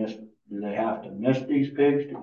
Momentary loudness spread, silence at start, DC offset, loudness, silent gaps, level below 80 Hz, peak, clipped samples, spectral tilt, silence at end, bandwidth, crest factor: 13 LU; 0 s; under 0.1%; -26 LUFS; none; -72 dBFS; -10 dBFS; under 0.1%; -8.5 dB/octave; 0 s; 6.8 kHz; 16 dB